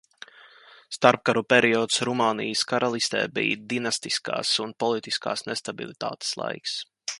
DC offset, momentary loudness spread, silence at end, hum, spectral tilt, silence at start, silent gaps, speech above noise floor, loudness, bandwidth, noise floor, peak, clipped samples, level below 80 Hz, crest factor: under 0.1%; 12 LU; 0 s; none; -3 dB/octave; 0.45 s; none; 27 dB; -25 LUFS; 11.5 kHz; -52 dBFS; 0 dBFS; under 0.1%; -70 dBFS; 26 dB